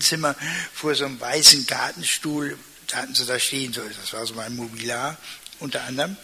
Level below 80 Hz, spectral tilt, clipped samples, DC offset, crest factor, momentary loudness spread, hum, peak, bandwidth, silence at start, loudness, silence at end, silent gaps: -62 dBFS; -1 dB/octave; under 0.1%; under 0.1%; 24 dB; 19 LU; none; 0 dBFS; 16 kHz; 0 s; -21 LUFS; 0 s; none